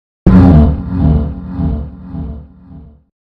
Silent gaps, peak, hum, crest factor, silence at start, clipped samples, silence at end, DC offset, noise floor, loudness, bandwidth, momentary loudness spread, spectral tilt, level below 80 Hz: none; 0 dBFS; none; 12 dB; 0.25 s; 1%; 0.5 s; under 0.1%; -36 dBFS; -11 LUFS; 4.9 kHz; 20 LU; -11 dB/octave; -20 dBFS